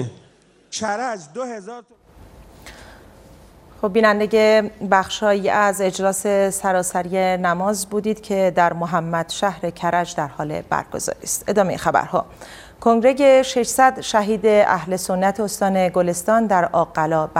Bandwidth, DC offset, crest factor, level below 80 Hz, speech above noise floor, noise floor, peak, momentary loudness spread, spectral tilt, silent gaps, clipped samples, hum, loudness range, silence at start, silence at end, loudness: 16 kHz; under 0.1%; 20 dB; -52 dBFS; 35 dB; -53 dBFS; 0 dBFS; 11 LU; -4.5 dB/octave; none; under 0.1%; none; 6 LU; 0 s; 0 s; -19 LUFS